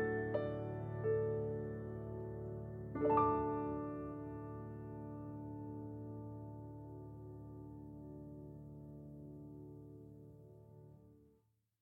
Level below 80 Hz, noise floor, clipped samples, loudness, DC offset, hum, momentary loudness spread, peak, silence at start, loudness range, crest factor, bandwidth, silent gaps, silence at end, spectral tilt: -62 dBFS; -77 dBFS; under 0.1%; -43 LUFS; under 0.1%; none; 19 LU; -20 dBFS; 0 s; 15 LU; 24 dB; 4.4 kHz; none; 0.55 s; -10.5 dB/octave